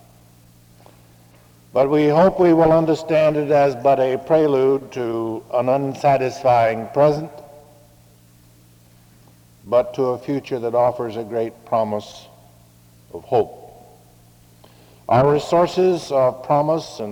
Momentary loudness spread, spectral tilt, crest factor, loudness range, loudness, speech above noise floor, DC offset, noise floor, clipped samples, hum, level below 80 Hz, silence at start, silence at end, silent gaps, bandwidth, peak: 11 LU; -7 dB/octave; 18 dB; 10 LU; -18 LUFS; 33 dB; under 0.1%; -50 dBFS; under 0.1%; none; -54 dBFS; 1.75 s; 0 s; none; 19 kHz; -2 dBFS